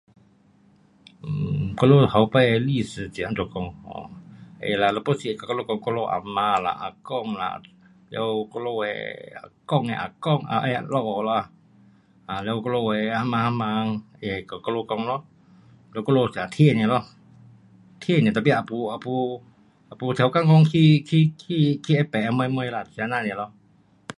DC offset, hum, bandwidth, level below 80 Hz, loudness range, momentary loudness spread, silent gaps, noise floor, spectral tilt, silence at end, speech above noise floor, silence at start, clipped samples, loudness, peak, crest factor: under 0.1%; none; 11 kHz; -56 dBFS; 7 LU; 15 LU; none; -58 dBFS; -7.5 dB/octave; 0.05 s; 36 dB; 1.25 s; under 0.1%; -23 LUFS; -2 dBFS; 22 dB